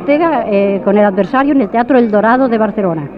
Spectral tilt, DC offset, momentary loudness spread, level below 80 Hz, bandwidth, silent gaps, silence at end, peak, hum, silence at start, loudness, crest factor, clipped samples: -9.5 dB/octave; under 0.1%; 3 LU; -46 dBFS; 5.4 kHz; none; 0 s; 0 dBFS; none; 0 s; -12 LUFS; 12 dB; under 0.1%